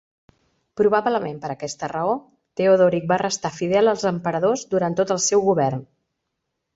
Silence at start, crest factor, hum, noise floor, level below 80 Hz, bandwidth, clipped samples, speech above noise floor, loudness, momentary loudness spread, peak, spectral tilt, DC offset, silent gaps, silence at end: 0.75 s; 16 dB; none; -78 dBFS; -62 dBFS; 8 kHz; under 0.1%; 58 dB; -21 LUFS; 12 LU; -4 dBFS; -4.5 dB/octave; under 0.1%; none; 0.9 s